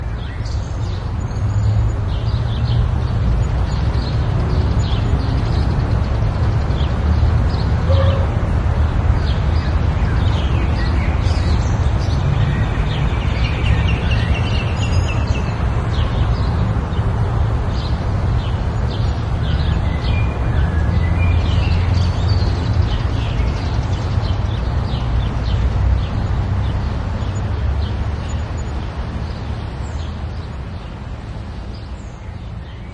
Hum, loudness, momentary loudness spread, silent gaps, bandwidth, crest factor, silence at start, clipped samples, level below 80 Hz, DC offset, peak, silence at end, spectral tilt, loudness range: none; -19 LUFS; 9 LU; none; 8.4 kHz; 14 dB; 0 s; under 0.1%; -22 dBFS; under 0.1%; -2 dBFS; 0 s; -7 dB/octave; 6 LU